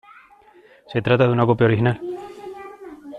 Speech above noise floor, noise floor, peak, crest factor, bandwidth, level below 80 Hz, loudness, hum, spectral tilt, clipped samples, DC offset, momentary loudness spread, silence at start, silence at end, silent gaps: 33 dB; -51 dBFS; -4 dBFS; 18 dB; 4.9 kHz; -54 dBFS; -19 LUFS; none; -9 dB/octave; under 0.1%; under 0.1%; 20 LU; 0.9 s; 0 s; none